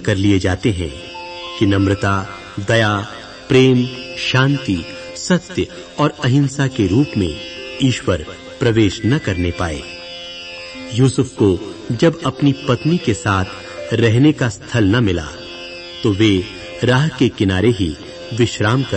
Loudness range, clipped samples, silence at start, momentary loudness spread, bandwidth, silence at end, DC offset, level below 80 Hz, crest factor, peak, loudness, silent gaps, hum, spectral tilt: 3 LU; under 0.1%; 0 s; 14 LU; 8.8 kHz; 0 s; under 0.1%; -40 dBFS; 16 dB; -2 dBFS; -17 LUFS; none; none; -6 dB/octave